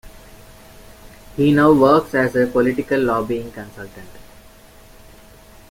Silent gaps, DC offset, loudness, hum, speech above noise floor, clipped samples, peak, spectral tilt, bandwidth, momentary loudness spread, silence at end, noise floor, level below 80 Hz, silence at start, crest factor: none; under 0.1%; -16 LUFS; none; 28 dB; under 0.1%; -2 dBFS; -7 dB/octave; 16.5 kHz; 22 LU; 1.5 s; -45 dBFS; -46 dBFS; 0.05 s; 18 dB